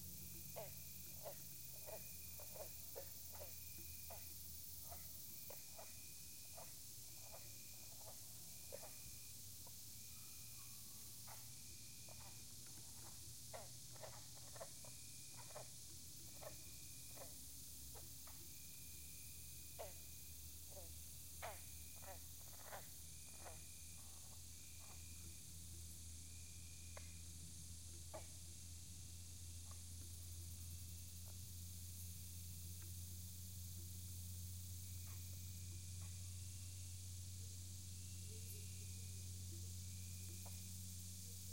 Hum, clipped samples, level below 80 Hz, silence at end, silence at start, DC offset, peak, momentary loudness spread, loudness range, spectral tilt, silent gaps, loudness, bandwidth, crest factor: none; under 0.1%; -70 dBFS; 0 s; 0 s; under 0.1%; -36 dBFS; 3 LU; 3 LU; -3 dB/octave; none; -54 LUFS; 16.5 kHz; 18 dB